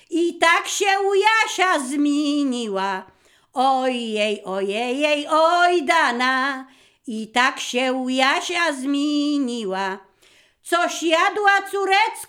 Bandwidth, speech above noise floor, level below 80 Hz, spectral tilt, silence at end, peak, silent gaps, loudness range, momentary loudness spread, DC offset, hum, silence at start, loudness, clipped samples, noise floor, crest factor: 16.5 kHz; 36 dB; -74 dBFS; -2 dB/octave; 0.05 s; -2 dBFS; none; 3 LU; 8 LU; under 0.1%; none; 0.1 s; -20 LUFS; under 0.1%; -56 dBFS; 18 dB